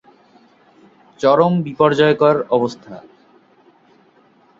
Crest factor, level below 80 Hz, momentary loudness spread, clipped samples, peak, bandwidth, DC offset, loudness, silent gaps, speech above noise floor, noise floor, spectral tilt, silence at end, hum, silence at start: 18 dB; -60 dBFS; 22 LU; under 0.1%; -2 dBFS; 7.6 kHz; under 0.1%; -15 LUFS; none; 38 dB; -53 dBFS; -7 dB/octave; 1.6 s; none; 1.2 s